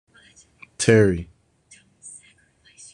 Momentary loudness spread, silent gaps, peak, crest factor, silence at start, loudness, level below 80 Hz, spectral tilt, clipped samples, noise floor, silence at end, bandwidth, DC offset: 26 LU; none; -2 dBFS; 22 dB; 0.8 s; -19 LUFS; -52 dBFS; -5.5 dB/octave; under 0.1%; -57 dBFS; 0.75 s; 11 kHz; under 0.1%